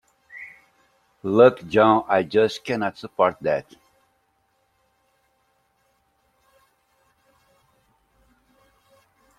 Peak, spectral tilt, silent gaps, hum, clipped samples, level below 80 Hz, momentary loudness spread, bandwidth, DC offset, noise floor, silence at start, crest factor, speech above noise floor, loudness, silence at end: -2 dBFS; -6.5 dB/octave; none; none; under 0.1%; -66 dBFS; 24 LU; 12 kHz; under 0.1%; -68 dBFS; 0.35 s; 24 dB; 48 dB; -20 LUFS; 5.75 s